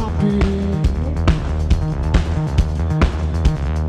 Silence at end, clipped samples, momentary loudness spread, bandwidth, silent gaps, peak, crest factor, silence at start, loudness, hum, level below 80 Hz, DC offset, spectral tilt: 0 s; under 0.1%; 2 LU; 9.4 kHz; none; 0 dBFS; 16 dB; 0 s; -19 LUFS; none; -20 dBFS; under 0.1%; -7.5 dB/octave